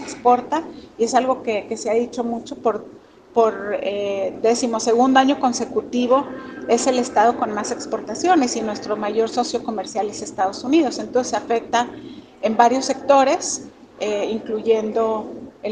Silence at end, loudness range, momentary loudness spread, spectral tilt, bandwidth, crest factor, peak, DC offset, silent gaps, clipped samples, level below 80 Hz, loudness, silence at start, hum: 0 s; 3 LU; 10 LU; -3.5 dB/octave; 10 kHz; 20 dB; 0 dBFS; under 0.1%; none; under 0.1%; -60 dBFS; -20 LUFS; 0 s; none